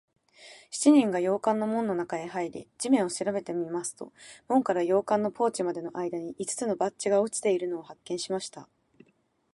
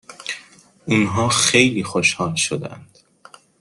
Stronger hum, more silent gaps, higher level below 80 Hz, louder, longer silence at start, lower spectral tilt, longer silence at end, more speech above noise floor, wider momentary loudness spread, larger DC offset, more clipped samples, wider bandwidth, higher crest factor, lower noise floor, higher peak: neither; neither; second, -74 dBFS vs -56 dBFS; second, -28 LUFS vs -17 LUFS; first, 0.4 s vs 0.1 s; first, -4.5 dB/octave vs -3 dB/octave; first, 0.9 s vs 0.75 s; first, 41 dB vs 29 dB; second, 10 LU vs 17 LU; neither; neither; about the same, 11.5 kHz vs 12.5 kHz; about the same, 20 dB vs 22 dB; first, -69 dBFS vs -48 dBFS; second, -10 dBFS vs 0 dBFS